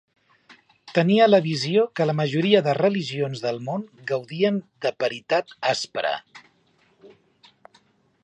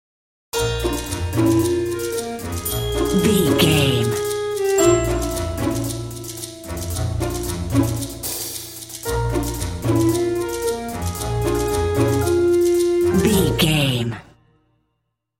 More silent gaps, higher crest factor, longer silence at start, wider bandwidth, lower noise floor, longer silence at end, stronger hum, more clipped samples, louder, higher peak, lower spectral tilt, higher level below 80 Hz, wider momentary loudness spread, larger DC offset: neither; about the same, 20 dB vs 18 dB; first, 0.85 s vs 0.55 s; second, 10 kHz vs 17 kHz; second, -63 dBFS vs -74 dBFS; about the same, 1.15 s vs 1.15 s; neither; neither; second, -23 LUFS vs -20 LUFS; about the same, -4 dBFS vs -2 dBFS; about the same, -6 dB/octave vs -5 dB/octave; second, -72 dBFS vs -34 dBFS; about the same, 11 LU vs 11 LU; neither